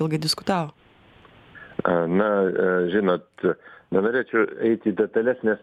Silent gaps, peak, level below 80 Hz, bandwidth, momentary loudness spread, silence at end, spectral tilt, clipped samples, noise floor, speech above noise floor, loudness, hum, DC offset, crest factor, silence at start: none; -4 dBFS; -62 dBFS; 14 kHz; 6 LU; 0.05 s; -6 dB/octave; under 0.1%; -53 dBFS; 30 dB; -23 LUFS; none; under 0.1%; 18 dB; 0 s